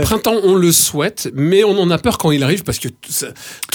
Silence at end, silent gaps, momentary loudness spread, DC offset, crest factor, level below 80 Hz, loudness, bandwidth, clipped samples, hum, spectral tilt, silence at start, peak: 0.1 s; none; 11 LU; under 0.1%; 14 dB; -38 dBFS; -14 LUFS; over 20 kHz; under 0.1%; none; -4 dB/octave; 0 s; 0 dBFS